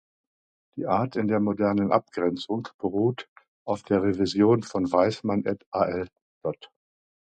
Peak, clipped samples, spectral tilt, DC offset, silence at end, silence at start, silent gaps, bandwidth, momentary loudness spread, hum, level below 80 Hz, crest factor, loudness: -6 dBFS; under 0.1%; -7 dB/octave; under 0.1%; 0.75 s; 0.75 s; 2.74-2.79 s, 3.28-3.36 s, 3.48-3.66 s, 5.66-5.72 s, 6.22-6.41 s; 9 kHz; 13 LU; none; -58 dBFS; 20 dB; -26 LUFS